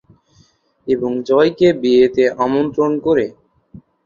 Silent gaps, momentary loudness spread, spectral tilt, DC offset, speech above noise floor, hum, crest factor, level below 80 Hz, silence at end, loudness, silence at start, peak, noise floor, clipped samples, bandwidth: none; 8 LU; -7 dB/octave; under 0.1%; 40 dB; none; 14 dB; -54 dBFS; 0.75 s; -15 LUFS; 0.85 s; -2 dBFS; -55 dBFS; under 0.1%; 7.2 kHz